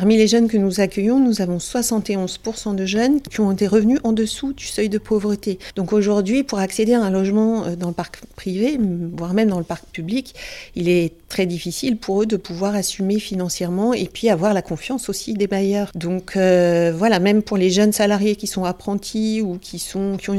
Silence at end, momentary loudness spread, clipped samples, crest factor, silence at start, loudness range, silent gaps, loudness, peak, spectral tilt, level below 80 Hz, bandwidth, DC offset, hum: 0 s; 10 LU; under 0.1%; 16 dB; 0 s; 4 LU; none; -19 LUFS; -2 dBFS; -5.5 dB/octave; -46 dBFS; 15.5 kHz; under 0.1%; none